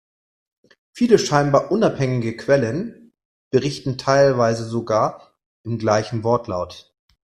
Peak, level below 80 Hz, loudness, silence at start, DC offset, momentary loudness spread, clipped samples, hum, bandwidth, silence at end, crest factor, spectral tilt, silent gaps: -2 dBFS; -54 dBFS; -20 LUFS; 0.95 s; under 0.1%; 12 LU; under 0.1%; none; 12.5 kHz; 0.55 s; 20 dB; -6 dB/octave; 3.25-3.51 s, 5.46-5.64 s